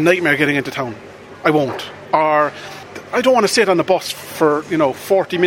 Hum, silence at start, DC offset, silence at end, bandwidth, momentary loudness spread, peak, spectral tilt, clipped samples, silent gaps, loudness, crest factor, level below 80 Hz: none; 0 s; under 0.1%; 0 s; 17.5 kHz; 14 LU; 0 dBFS; -4.5 dB/octave; under 0.1%; none; -16 LUFS; 16 dB; -60 dBFS